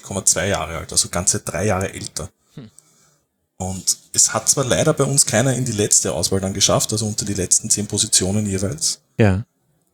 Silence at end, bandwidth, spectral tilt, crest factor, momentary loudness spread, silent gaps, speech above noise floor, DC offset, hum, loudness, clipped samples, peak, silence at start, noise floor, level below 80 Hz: 0.5 s; over 20 kHz; -3 dB/octave; 20 dB; 9 LU; none; 46 dB; under 0.1%; none; -17 LUFS; under 0.1%; 0 dBFS; 0.05 s; -65 dBFS; -50 dBFS